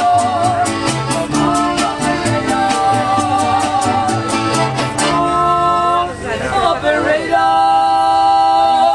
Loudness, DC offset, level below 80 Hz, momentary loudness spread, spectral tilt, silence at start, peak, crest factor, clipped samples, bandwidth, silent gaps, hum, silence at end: -14 LUFS; under 0.1%; -40 dBFS; 5 LU; -4 dB/octave; 0 s; -2 dBFS; 12 dB; under 0.1%; 12.5 kHz; none; none; 0 s